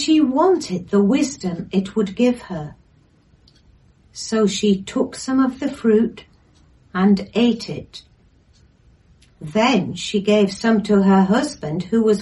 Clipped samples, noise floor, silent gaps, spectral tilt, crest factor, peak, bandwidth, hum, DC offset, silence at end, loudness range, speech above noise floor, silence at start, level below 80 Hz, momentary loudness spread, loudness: under 0.1%; -55 dBFS; none; -6 dB/octave; 16 dB; -4 dBFS; 11.5 kHz; none; under 0.1%; 0 s; 5 LU; 37 dB; 0 s; -52 dBFS; 15 LU; -19 LUFS